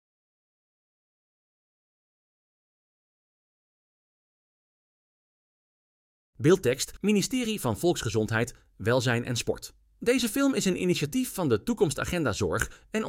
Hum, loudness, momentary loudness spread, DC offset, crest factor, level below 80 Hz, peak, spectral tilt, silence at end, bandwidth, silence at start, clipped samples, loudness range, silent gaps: none; -27 LUFS; 7 LU; under 0.1%; 22 dB; -54 dBFS; -8 dBFS; -5 dB/octave; 0 s; 16.5 kHz; 6.4 s; under 0.1%; 4 LU; none